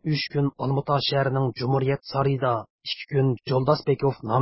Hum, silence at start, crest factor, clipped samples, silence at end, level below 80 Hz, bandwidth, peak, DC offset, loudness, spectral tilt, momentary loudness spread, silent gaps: none; 0.05 s; 18 dB; under 0.1%; 0 s; -58 dBFS; 5.8 kHz; -6 dBFS; under 0.1%; -24 LUFS; -10 dB/octave; 5 LU; 2.70-2.79 s